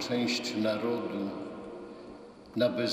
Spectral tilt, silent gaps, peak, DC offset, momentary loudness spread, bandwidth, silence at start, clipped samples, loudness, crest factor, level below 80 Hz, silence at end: -4.5 dB/octave; none; -14 dBFS; under 0.1%; 17 LU; 15.5 kHz; 0 s; under 0.1%; -32 LUFS; 20 dB; -68 dBFS; 0 s